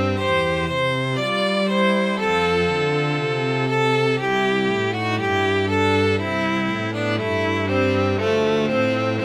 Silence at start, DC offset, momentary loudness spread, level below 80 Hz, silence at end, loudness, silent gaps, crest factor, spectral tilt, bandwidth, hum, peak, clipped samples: 0 s; under 0.1%; 3 LU; -50 dBFS; 0 s; -20 LUFS; none; 12 dB; -6 dB/octave; 13.5 kHz; none; -8 dBFS; under 0.1%